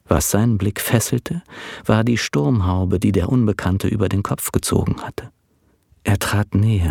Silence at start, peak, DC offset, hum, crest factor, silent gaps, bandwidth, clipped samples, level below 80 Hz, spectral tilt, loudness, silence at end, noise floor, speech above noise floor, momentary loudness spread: 0.1 s; 0 dBFS; under 0.1%; none; 18 dB; none; 18 kHz; under 0.1%; -38 dBFS; -5.5 dB/octave; -19 LUFS; 0 s; -61 dBFS; 42 dB; 10 LU